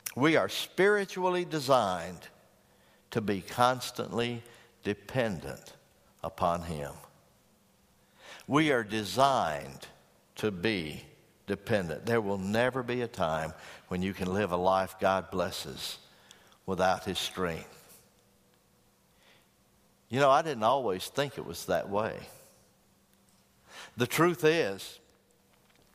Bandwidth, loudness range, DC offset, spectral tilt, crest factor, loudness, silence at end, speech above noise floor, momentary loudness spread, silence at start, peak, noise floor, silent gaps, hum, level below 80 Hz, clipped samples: 15.5 kHz; 5 LU; under 0.1%; -5 dB/octave; 22 dB; -30 LUFS; 0.95 s; 36 dB; 19 LU; 0.05 s; -10 dBFS; -66 dBFS; none; none; -62 dBFS; under 0.1%